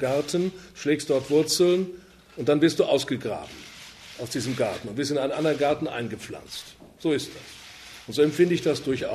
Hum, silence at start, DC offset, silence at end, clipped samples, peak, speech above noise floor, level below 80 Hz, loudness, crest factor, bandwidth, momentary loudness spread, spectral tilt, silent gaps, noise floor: none; 0 s; under 0.1%; 0 s; under 0.1%; -6 dBFS; 20 dB; -60 dBFS; -25 LUFS; 18 dB; 14 kHz; 21 LU; -5 dB/octave; none; -45 dBFS